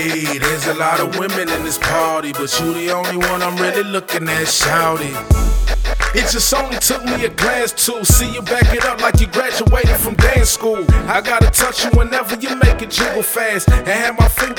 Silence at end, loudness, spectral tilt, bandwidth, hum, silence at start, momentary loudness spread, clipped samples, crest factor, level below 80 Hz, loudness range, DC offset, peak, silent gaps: 0 s; -15 LUFS; -3.5 dB/octave; 20 kHz; none; 0 s; 6 LU; under 0.1%; 14 dB; -20 dBFS; 3 LU; under 0.1%; 0 dBFS; none